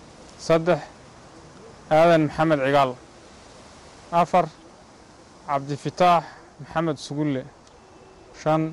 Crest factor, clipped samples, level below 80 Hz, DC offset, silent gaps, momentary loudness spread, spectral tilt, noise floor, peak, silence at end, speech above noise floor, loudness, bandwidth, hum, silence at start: 14 dB; under 0.1%; -56 dBFS; under 0.1%; none; 20 LU; -6.5 dB/octave; -49 dBFS; -10 dBFS; 0 s; 28 dB; -22 LUFS; 12.5 kHz; none; 0.4 s